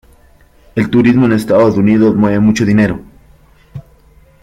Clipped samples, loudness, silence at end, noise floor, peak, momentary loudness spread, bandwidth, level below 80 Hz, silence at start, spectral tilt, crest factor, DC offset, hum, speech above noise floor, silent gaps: under 0.1%; -11 LUFS; 0.65 s; -45 dBFS; 0 dBFS; 7 LU; 13 kHz; -42 dBFS; 0.75 s; -7.5 dB/octave; 12 dB; under 0.1%; none; 36 dB; none